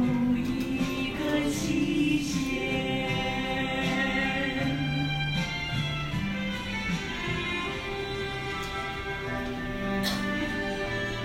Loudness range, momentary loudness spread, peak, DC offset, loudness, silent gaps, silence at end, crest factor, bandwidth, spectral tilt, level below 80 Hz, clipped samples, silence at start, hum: 4 LU; 6 LU; -14 dBFS; under 0.1%; -29 LUFS; none; 0 s; 14 dB; 16 kHz; -5 dB/octave; -44 dBFS; under 0.1%; 0 s; none